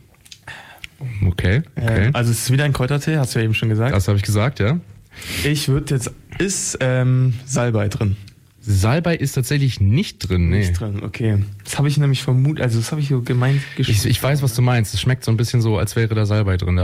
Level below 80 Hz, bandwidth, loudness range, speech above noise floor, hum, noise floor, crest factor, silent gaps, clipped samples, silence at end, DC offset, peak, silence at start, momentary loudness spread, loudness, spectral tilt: -38 dBFS; 16 kHz; 2 LU; 24 dB; none; -42 dBFS; 10 dB; none; under 0.1%; 0 s; under 0.1%; -8 dBFS; 0.45 s; 7 LU; -19 LUFS; -5.5 dB/octave